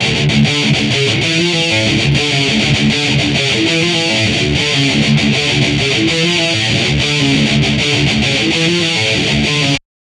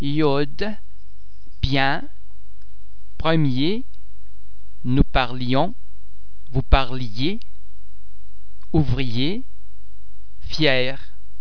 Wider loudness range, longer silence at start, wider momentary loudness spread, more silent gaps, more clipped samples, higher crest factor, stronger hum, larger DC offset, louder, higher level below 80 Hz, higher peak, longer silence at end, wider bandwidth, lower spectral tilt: second, 0 LU vs 3 LU; about the same, 0 s vs 0 s; second, 1 LU vs 12 LU; neither; neither; second, 12 dB vs 24 dB; neither; second, under 0.1% vs 10%; first, -12 LUFS vs -23 LUFS; about the same, -34 dBFS vs -30 dBFS; about the same, 0 dBFS vs 0 dBFS; first, 0.3 s vs 0.05 s; first, 12 kHz vs 5.4 kHz; second, -4 dB/octave vs -7 dB/octave